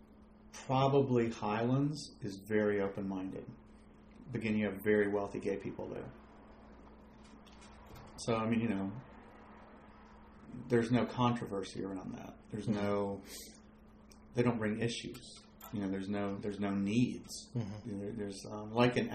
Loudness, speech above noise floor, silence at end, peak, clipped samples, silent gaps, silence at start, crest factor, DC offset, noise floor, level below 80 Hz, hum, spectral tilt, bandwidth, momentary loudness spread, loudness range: -36 LUFS; 24 dB; 0 s; -14 dBFS; under 0.1%; none; 0 s; 22 dB; under 0.1%; -59 dBFS; -62 dBFS; none; -6.5 dB/octave; 14.5 kHz; 24 LU; 6 LU